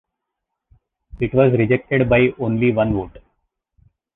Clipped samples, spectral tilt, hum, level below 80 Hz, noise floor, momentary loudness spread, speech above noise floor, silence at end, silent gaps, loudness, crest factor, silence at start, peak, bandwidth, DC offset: under 0.1%; -11 dB/octave; none; -42 dBFS; -80 dBFS; 10 LU; 63 dB; 0.95 s; none; -18 LUFS; 18 dB; 1.15 s; -2 dBFS; 4 kHz; under 0.1%